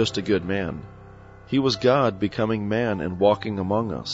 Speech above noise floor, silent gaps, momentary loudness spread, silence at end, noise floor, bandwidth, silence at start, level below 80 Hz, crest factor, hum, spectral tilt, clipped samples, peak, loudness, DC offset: 22 dB; none; 7 LU; 0 s; -45 dBFS; 8 kHz; 0 s; -50 dBFS; 18 dB; none; -6 dB/octave; under 0.1%; -6 dBFS; -23 LUFS; under 0.1%